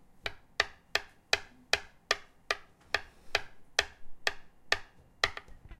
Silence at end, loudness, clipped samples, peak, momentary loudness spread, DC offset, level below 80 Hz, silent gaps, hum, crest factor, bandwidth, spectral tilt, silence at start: 0.05 s; -34 LUFS; under 0.1%; -6 dBFS; 7 LU; under 0.1%; -56 dBFS; none; none; 32 dB; 16 kHz; -0.5 dB/octave; 0.15 s